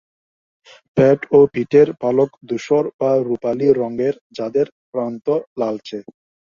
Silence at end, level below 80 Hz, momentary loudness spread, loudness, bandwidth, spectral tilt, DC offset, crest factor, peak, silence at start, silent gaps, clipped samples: 0.5 s; -58 dBFS; 11 LU; -18 LUFS; 7.2 kHz; -8 dB/octave; under 0.1%; 16 dB; -2 dBFS; 0.95 s; 2.94-2.99 s, 4.21-4.30 s, 4.72-4.93 s, 5.47-5.56 s; under 0.1%